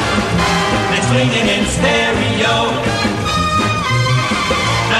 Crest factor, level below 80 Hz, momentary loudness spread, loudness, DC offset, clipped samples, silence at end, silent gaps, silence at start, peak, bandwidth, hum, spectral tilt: 12 dB; -32 dBFS; 3 LU; -14 LUFS; under 0.1%; under 0.1%; 0 s; none; 0 s; -2 dBFS; 13 kHz; none; -4.5 dB/octave